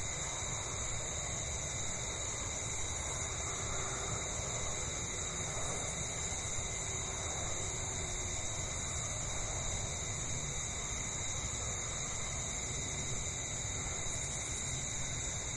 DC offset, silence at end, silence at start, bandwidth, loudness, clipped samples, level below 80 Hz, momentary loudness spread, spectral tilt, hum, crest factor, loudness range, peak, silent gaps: under 0.1%; 0 s; 0 s; 11.5 kHz; -37 LUFS; under 0.1%; -48 dBFS; 1 LU; -2 dB/octave; none; 14 dB; 0 LU; -24 dBFS; none